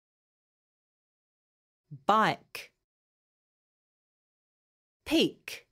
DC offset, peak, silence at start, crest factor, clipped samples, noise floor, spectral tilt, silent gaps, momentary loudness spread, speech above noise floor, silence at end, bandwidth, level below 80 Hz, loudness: under 0.1%; -10 dBFS; 1.9 s; 26 dB; under 0.1%; under -90 dBFS; -4.5 dB/octave; 2.84-5.00 s; 19 LU; over 61 dB; 0.15 s; 16 kHz; -68 dBFS; -28 LUFS